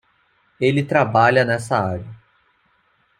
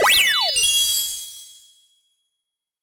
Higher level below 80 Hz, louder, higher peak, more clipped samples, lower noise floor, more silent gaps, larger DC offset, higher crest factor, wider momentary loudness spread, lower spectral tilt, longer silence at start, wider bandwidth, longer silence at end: about the same, -58 dBFS vs -56 dBFS; about the same, -18 LUFS vs -16 LUFS; first, -2 dBFS vs -6 dBFS; neither; second, -62 dBFS vs -82 dBFS; neither; neither; about the same, 18 dB vs 16 dB; second, 13 LU vs 19 LU; first, -6.5 dB/octave vs 2.5 dB/octave; first, 0.6 s vs 0 s; second, 13.5 kHz vs 16 kHz; second, 1.05 s vs 1.4 s